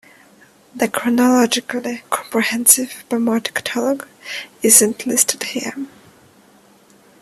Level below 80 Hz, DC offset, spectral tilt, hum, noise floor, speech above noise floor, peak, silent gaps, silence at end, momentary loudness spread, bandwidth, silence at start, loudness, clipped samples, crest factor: -64 dBFS; under 0.1%; -2 dB/octave; none; -50 dBFS; 33 dB; 0 dBFS; none; 1.35 s; 16 LU; 15 kHz; 0.75 s; -16 LUFS; under 0.1%; 20 dB